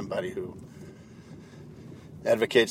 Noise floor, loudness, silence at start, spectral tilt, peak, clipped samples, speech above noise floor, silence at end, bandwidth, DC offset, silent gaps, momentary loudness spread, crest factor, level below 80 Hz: -47 dBFS; -28 LUFS; 0 s; -4.5 dB/octave; -6 dBFS; under 0.1%; 21 dB; 0 s; 16 kHz; under 0.1%; none; 24 LU; 24 dB; -62 dBFS